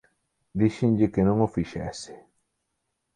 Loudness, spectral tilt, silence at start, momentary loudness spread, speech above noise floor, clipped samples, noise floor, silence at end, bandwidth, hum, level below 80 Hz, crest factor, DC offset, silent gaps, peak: -25 LUFS; -7.5 dB/octave; 0.55 s; 15 LU; 54 dB; under 0.1%; -79 dBFS; 1 s; 10 kHz; none; -50 dBFS; 18 dB; under 0.1%; none; -8 dBFS